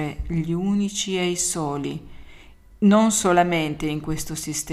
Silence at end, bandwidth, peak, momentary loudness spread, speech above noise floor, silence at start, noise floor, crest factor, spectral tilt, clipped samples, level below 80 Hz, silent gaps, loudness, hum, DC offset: 0 s; 15.5 kHz; -4 dBFS; 11 LU; 24 dB; 0 s; -46 dBFS; 18 dB; -4.5 dB/octave; under 0.1%; -42 dBFS; none; -22 LUFS; none; under 0.1%